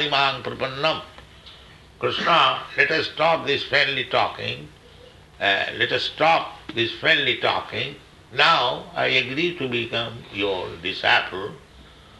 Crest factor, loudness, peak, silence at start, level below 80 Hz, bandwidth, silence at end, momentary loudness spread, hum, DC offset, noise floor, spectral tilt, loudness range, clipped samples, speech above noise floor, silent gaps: 22 dB; -21 LUFS; -2 dBFS; 0 s; -54 dBFS; 12 kHz; 0.4 s; 12 LU; none; under 0.1%; -47 dBFS; -4 dB/octave; 2 LU; under 0.1%; 25 dB; none